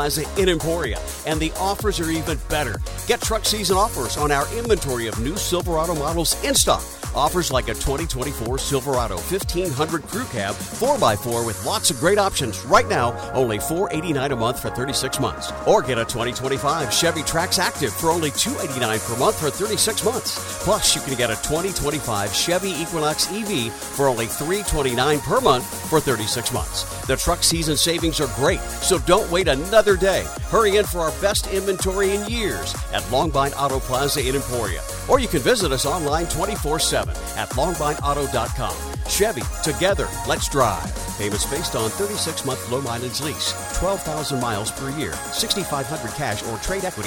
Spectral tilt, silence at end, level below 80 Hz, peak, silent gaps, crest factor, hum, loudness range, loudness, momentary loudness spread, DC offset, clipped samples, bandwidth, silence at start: -3.5 dB/octave; 0 s; -34 dBFS; -2 dBFS; none; 18 dB; none; 4 LU; -21 LUFS; 7 LU; under 0.1%; under 0.1%; 17.5 kHz; 0 s